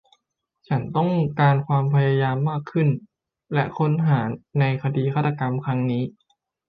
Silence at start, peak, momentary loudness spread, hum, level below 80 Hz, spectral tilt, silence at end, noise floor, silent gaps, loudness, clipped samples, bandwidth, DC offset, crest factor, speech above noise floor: 0.7 s; -6 dBFS; 7 LU; none; -60 dBFS; -10.5 dB/octave; 0.6 s; -74 dBFS; none; -22 LUFS; under 0.1%; 4.9 kHz; under 0.1%; 16 dB; 53 dB